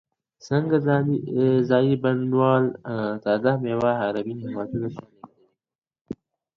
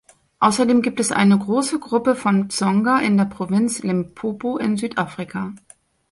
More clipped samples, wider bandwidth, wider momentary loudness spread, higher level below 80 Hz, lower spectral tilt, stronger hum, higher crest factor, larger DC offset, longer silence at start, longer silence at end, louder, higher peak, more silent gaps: neither; second, 7 kHz vs 11.5 kHz; first, 13 LU vs 10 LU; about the same, -62 dBFS vs -58 dBFS; first, -8.5 dB/octave vs -5.5 dB/octave; neither; about the same, 18 dB vs 16 dB; neither; about the same, 0.45 s vs 0.4 s; second, 0.4 s vs 0.55 s; second, -23 LUFS vs -20 LUFS; second, -6 dBFS vs -2 dBFS; first, 5.75-5.82 s, 6.01-6.05 s vs none